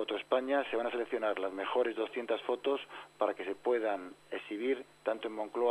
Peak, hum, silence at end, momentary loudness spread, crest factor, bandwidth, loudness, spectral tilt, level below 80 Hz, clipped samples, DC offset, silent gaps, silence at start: -16 dBFS; 50 Hz at -75 dBFS; 0 s; 6 LU; 18 dB; 10.5 kHz; -35 LUFS; -4.5 dB/octave; -82 dBFS; under 0.1%; under 0.1%; none; 0 s